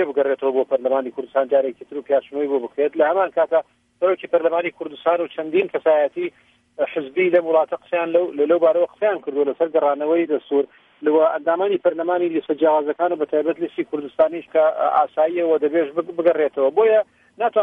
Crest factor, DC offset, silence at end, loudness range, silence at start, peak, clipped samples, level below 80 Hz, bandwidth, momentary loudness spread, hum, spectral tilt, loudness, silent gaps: 16 dB; under 0.1%; 0 s; 2 LU; 0 s; -4 dBFS; under 0.1%; -72 dBFS; 3.8 kHz; 7 LU; none; -7.5 dB/octave; -20 LUFS; none